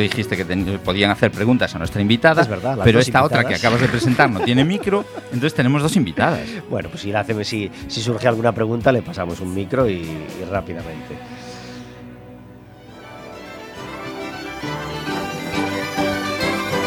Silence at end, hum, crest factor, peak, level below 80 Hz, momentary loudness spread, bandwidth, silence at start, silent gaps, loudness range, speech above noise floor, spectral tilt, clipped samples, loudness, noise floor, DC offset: 0 s; none; 20 dB; 0 dBFS; -44 dBFS; 19 LU; 19 kHz; 0 s; none; 16 LU; 22 dB; -5.5 dB/octave; under 0.1%; -19 LUFS; -41 dBFS; under 0.1%